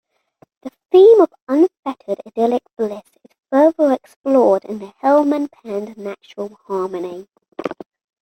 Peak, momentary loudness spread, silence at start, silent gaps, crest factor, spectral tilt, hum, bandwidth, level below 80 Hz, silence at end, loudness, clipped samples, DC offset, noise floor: -2 dBFS; 19 LU; 0.65 s; 1.42-1.47 s, 1.79-1.83 s, 2.73-2.77 s, 4.16-4.24 s, 7.48-7.52 s; 16 dB; -7 dB/octave; none; 8.6 kHz; -68 dBFS; 0.5 s; -16 LUFS; under 0.1%; under 0.1%; -55 dBFS